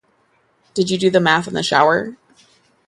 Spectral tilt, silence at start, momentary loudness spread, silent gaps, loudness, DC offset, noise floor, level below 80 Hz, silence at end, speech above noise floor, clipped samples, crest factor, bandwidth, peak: -4.5 dB/octave; 0.75 s; 10 LU; none; -16 LUFS; under 0.1%; -60 dBFS; -58 dBFS; 0.75 s; 44 dB; under 0.1%; 18 dB; 11.5 kHz; 0 dBFS